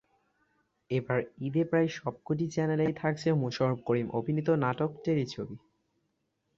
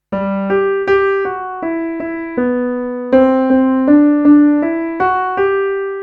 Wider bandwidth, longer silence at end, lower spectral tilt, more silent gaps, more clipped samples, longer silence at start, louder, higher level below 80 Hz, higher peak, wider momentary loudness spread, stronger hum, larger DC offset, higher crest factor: first, 7.8 kHz vs 5.2 kHz; first, 1 s vs 0 s; second, -7.5 dB/octave vs -9 dB/octave; neither; neither; first, 0.9 s vs 0.1 s; second, -30 LUFS vs -14 LUFS; second, -66 dBFS vs -48 dBFS; second, -14 dBFS vs 0 dBFS; second, 6 LU vs 11 LU; neither; neither; about the same, 18 dB vs 14 dB